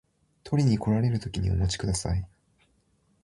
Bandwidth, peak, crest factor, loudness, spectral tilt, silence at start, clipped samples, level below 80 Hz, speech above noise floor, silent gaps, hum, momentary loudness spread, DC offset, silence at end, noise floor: 11.5 kHz; -12 dBFS; 16 dB; -27 LUFS; -6 dB/octave; 0.45 s; under 0.1%; -40 dBFS; 42 dB; none; none; 7 LU; under 0.1%; 0.95 s; -68 dBFS